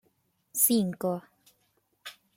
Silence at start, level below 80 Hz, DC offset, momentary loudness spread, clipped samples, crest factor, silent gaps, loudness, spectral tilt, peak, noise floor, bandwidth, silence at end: 0.55 s; -74 dBFS; under 0.1%; 23 LU; under 0.1%; 24 dB; none; -27 LUFS; -4 dB/octave; -8 dBFS; -73 dBFS; 16.5 kHz; 0.25 s